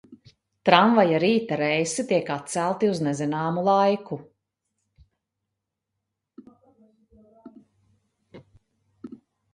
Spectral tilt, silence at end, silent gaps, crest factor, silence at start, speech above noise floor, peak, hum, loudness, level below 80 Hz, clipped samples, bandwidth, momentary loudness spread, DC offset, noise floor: -5 dB/octave; 0.4 s; none; 26 dB; 0.1 s; 61 dB; 0 dBFS; none; -22 LUFS; -68 dBFS; under 0.1%; 11.5 kHz; 18 LU; under 0.1%; -83 dBFS